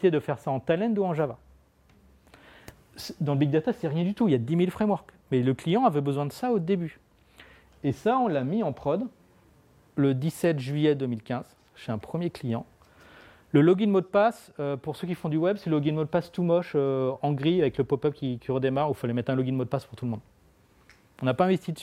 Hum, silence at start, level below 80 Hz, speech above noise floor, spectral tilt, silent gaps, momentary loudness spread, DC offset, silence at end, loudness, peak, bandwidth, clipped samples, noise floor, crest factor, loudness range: none; 0 s; -62 dBFS; 34 dB; -8 dB/octave; none; 10 LU; under 0.1%; 0 s; -27 LUFS; -8 dBFS; 15.5 kHz; under 0.1%; -60 dBFS; 18 dB; 4 LU